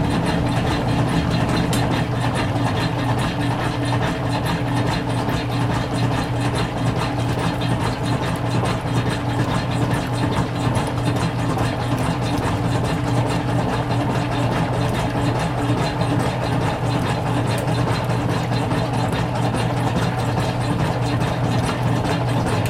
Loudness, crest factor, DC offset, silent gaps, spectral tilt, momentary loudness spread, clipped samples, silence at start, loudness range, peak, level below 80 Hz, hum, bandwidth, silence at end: -21 LUFS; 14 dB; under 0.1%; none; -6 dB/octave; 2 LU; under 0.1%; 0 s; 1 LU; -6 dBFS; -36 dBFS; none; 14.5 kHz; 0 s